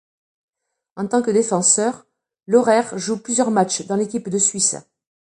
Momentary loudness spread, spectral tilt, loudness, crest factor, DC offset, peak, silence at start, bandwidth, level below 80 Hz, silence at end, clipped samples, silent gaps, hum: 9 LU; -3.5 dB/octave; -18 LUFS; 20 dB; under 0.1%; -2 dBFS; 0.95 s; 11.5 kHz; -68 dBFS; 0.45 s; under 0.1%; none; none